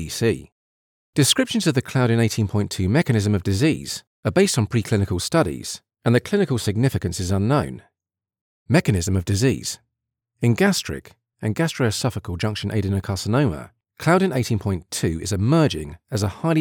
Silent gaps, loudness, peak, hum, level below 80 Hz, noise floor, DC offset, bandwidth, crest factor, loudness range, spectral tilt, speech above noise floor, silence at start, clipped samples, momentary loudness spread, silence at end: 0.52-1.13 s, 4.07-4.23 s, 8.41-8.66 s; -21 LUFS; -4 dBFS; none; -46 dBFS; -88 dBFS; under 0.1%; 18.5 kHz; 18 dB; 3 LU; -5.5 dB/octave; 67 dB; 0 s; under 0.1%; 9 LU; 0 s